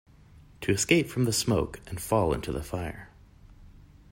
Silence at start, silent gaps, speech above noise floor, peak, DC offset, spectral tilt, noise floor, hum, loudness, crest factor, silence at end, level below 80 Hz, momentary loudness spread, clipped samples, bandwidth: 0.35 s; none; 26 dB; -8 dBFS; under 0.1%; -4.5 dB/octave; -54 dBFS; none; -28 LUFS; 22 dB; 0.3 s; -48 dBFS; 13 LU; under 0.1%; 16.5 kHz